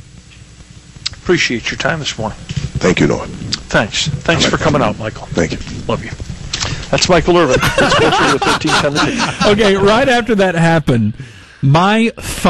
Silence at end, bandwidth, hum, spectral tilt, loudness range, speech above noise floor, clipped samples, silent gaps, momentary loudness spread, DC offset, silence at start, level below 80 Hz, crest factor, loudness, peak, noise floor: 0 s; 12.5 kHz; none; -4.5 dB/octave; 5 LU; 25 dB; under 0.1%; none; 12 LU; under 0.1%; 0.6 s; -32 dBFS; 14 dB; -13 LUFS; 0 dBFS; -38 dBFS